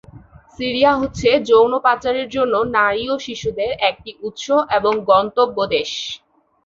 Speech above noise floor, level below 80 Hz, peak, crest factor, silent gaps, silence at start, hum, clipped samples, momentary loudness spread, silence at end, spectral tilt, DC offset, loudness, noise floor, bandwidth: 26 dB; -48 dBFS; -2 dBFS; 16 dB; none; 0.15 s; none; under 0.1%; 12 LU; 0.5 s; -4 dB/octave; under 0.1%; -17 LUFS; -43 dBFS; 7.6 kHz